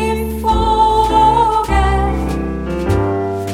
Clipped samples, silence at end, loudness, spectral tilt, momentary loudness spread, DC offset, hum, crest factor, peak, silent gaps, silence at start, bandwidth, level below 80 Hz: under 0.1%; 0 s; -15 LUFS; -6.5 dB/octave; 9 LU; 0.2%; none; 12 dB; -2 dBFS; none; 0 s; 15.5 kHz; -22 dBFS